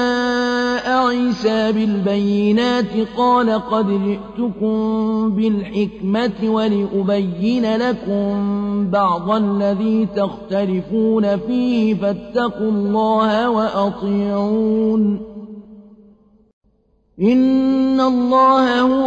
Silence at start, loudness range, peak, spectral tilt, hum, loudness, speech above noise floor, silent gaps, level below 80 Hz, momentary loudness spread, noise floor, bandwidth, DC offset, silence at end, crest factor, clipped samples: 0 s; 3 LU; -4 dBFS; -7 dB/octave; none; -17 LUFS; 43 dB; 16.53-16.61 s; -50 dBFS; 5 LU; -59 dBFS; 7.8 kHz; under 0.1%; 0 s; 12 dB; under 0.1%